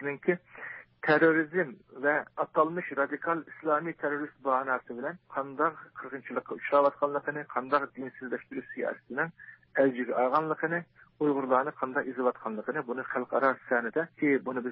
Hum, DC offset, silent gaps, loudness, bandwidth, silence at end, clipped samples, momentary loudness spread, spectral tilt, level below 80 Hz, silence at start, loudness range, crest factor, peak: none; under 0.1%; none; -30 LUFS; 5.6 kHz; 0 s; under 0.1%; 10 LU; -10 dB/octave; -80 dBFS; 0 s; 3 LU; 18 dB; -12 dBFS